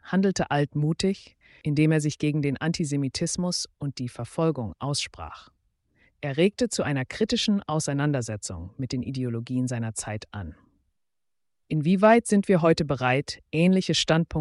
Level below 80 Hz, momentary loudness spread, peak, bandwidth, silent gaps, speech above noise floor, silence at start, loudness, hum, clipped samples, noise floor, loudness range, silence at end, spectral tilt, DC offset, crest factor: -52 dBFS; 13 LU; -8 dBFS; 11.5 kHz; none; 63 dB; 0.05 s; -25 LUFS; none; under 0.1%; -88 dBFS; 7 LU; 0 s; -5.5 dB/octave; under 0.1%; 16 dB